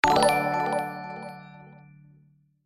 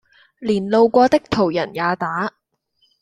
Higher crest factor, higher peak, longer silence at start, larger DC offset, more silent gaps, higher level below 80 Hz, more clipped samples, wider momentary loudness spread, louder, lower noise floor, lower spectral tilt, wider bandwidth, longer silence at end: first, 26 dB vs 16 dB; about the same, -2 dBFS vs -2 dBFS; second, 0.05 s vs 0.4 s; neither; neither; about the same, -54 dBFS vs -52 dBFS; neither; first, 23 LU vs 11 LU; second, -25 LUFS vs -18 LUFS; second, -61 dBFS vs -65 dBFS; second, -4 dB/octave vs -6.5 dB/octave; first, 15.5 kHz vs 12 kHz; first, 0.9 s vs 0.75 s